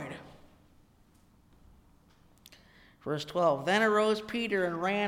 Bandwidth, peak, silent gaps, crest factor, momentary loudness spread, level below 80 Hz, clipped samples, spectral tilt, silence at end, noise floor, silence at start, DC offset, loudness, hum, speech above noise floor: 16 kHz; -14 dBFS; none; 20 dB; 17 LU; -66 dBFS; under 0.1%; -5 dB/octave; 0 s; -63 dBFS; 0 s; under 0.1%; -29 LUFS; none; 34 dB